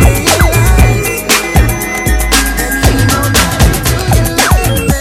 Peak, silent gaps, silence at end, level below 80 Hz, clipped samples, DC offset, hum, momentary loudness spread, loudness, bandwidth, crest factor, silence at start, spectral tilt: 0 dBFS; none; 0 s; -14 dBFS; 0.7%; under 0.1%; none; 4 LU; -10 LUFS; 18 kHz; 10 dB; 0 s; -4 dB/octave